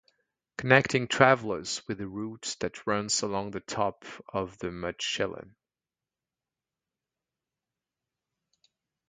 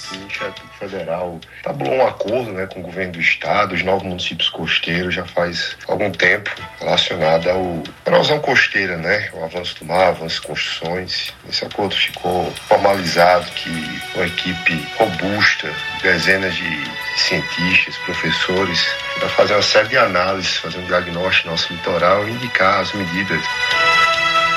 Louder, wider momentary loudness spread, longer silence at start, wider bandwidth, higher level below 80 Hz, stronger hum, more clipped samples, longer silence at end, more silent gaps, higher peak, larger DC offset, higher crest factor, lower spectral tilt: second, -28 LUFS vs -17 LUFS; first, 14 LU vs 11 LU; first, 0.6 s vs 0 s; second, 9.6 kHz vs 15.5 kHz; second, -62 dBFS vs -52 dBFS; neither; neither; first, 3.6 s vs 0 s; neither; about the same, -2 dBFS vs 0 dBFS; neither; first, 28 dB vs 18 dB; about the same, -3.5 dB/octave vs -3.5 dB/octave